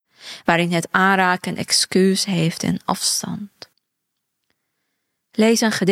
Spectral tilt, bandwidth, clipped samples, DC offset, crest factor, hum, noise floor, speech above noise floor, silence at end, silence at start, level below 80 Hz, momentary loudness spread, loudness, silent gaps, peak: -3.5 dB/octave; 16 kHz; under 0.1%; under 0.1%; 20 dB; none; -77 dBFS; 59 dB; 0 s; 0.25 s; -62 dBFS; 14 LU; -18 LUFS; none; -2 dBFS